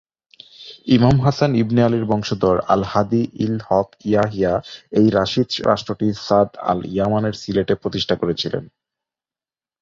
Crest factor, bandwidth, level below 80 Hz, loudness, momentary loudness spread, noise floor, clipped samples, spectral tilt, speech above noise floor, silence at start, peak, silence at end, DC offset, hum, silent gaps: 18 dB; 7.6 kHz; -46 dBFS; -19 LUFS; 7 LU; under -90 dBFS; under 0.1%; -7 dB/octave; over 72 dB; 0.6 s; -2 dBFS; 1.15 s; under 0.1%; none; none